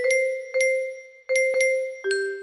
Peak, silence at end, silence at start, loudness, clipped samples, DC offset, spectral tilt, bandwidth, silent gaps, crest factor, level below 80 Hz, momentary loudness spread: -10 dBFS; 0 s; 0 s; -23 LUFS; under 0.1%; under 0.1%; 0 dB/octave; 11.5 kHz; none; 14 dB; -76 dBFS; 7 LU